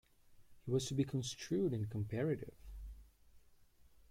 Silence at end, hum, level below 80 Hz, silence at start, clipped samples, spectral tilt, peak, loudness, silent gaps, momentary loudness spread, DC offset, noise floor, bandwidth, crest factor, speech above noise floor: 0.45 s; none; -60 dBFS; 0.3 s; under 0.1%; -6 dB/octave; -24 dBFS; -39 LUFS; none; 18 LU; under 0.1%; -66 dBFS; 16 kHz; 18 dB; 27 dB